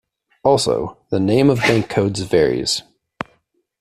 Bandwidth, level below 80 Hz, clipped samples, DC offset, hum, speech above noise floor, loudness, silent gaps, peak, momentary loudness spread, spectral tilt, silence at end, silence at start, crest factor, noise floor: 14.5 kHz; -48 dBFS; under 0.1%; under 0.1%; none; 46 dB; -17 LUFS; none; -2 dBFS; 18 LU; -5 dB/octave; 1 s; 0.45 s; 18 dB; -63 dBFS